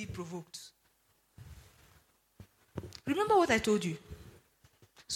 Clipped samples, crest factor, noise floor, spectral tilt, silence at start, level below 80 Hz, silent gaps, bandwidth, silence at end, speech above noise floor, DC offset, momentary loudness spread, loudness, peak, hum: under 0.1%; 22 dB; -72 dBFS; -4.5 dB/octave; 0 s; -60 dBFS; none; 16.5 kHz; 0 s; 41 dB; under 0.1%; 27 LU; -31 LUFS; -14 dBFS; none